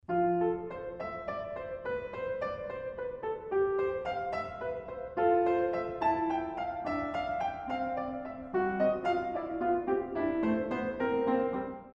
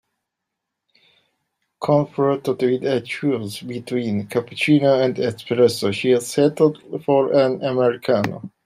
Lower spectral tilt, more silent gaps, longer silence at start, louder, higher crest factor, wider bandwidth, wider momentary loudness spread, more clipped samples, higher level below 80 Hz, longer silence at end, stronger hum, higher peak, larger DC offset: first, -8 dB/octave vs -6 dB/octave; neither; second, 0.1 s vs 1.8 s; second, -33 LUFS vs -20 LUFS; about the same, 16 dB vs 18 dB; second, 7 kHz vs 15 kHz; about the same, 9 LU vs 9 LU; neither; first, -58 dBFS vs -66 dBFS; about the same, 0.05 s vs 0.15 s; neither; second, -18 dBFS vs -4 dBFS; neither